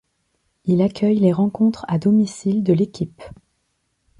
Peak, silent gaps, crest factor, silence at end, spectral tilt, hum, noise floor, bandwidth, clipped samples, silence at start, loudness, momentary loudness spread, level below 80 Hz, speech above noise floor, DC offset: -4 dBFS; none; 16 dB; 0.9 s; -8 dB/octave; none; -70 dBFS; 10.5 kHz; under 0.1%; 0.65 s; -19 LUFS; 9 LU; -56 dBFS; 52 dB; under 0.1%